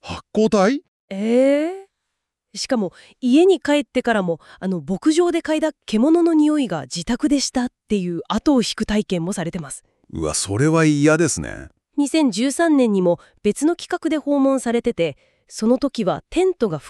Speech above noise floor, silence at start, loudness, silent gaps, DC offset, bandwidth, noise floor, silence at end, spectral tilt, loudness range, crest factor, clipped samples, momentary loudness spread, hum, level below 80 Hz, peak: 60 dB; 0.05 s; -19 LUFS; 0.88-1.08 s; under 0.1%; 12.5 kHz; -79 dBFS; 0 s; -5 dB/octave; 3 LU; 16 dB; under 0.1%; 11 LU; none; -48 dBFS; -4 dBFS